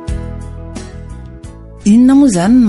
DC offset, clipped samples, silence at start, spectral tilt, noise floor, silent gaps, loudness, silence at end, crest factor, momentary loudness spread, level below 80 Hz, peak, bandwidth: under 0.1%; under 0.1%; 0 s; -6.5 dB/octave; -31 dBFS; none; -10 LUFS; 0 s; 12 dB; 24 LU; -30 dBFS; -2 dBFS; 11.5 kHz